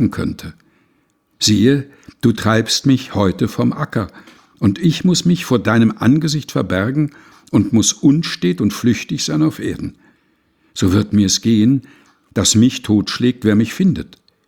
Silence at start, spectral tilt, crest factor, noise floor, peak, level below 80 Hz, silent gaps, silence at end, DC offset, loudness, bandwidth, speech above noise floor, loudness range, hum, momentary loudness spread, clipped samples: 0 s; -5 dB/octave; 16 dB; -61 dBFS; 0 dBFS; -48 dBFS; none; 0.45 s; under 0.1%; -16 LUFS; 17.5 kHz; 46 dB; 2 LU; none; 11 LU; under 0.1%